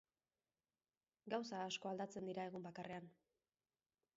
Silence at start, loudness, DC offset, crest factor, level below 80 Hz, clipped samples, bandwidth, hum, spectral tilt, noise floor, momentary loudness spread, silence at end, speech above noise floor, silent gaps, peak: 1.25 s; -48 LUFS; under 0.1%; 20 dB; under -90 dBFS; under 0.1%; 7.6 kHz; none; -3.5 dB/octave; under -90 dBFS; 9 LU; 1.05 s; over 42 dB; none; -32 dBFS